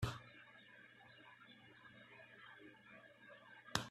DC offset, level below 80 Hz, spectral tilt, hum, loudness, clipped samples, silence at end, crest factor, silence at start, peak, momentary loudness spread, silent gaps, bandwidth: under 0.1%; -68 dBFS; -3.5 dB/octave; none; -55 LUFS; under 0.1%; 0 s; 36 dB; 0 s; -16 dBFS; 16 LU; none; 13 kHz